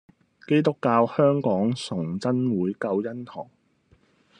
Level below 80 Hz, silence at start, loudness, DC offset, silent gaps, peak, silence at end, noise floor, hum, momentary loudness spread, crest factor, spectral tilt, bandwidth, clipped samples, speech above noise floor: -68 dBFS; 0.5 s; -24 LUFS; under 0.1%; none; -6 dBFS; 0.95 s; -62 dBFS; none; 15 LU; 18 dB; -7.5 dB/octave; 10.5 kHz; under 0.1%; 39 dB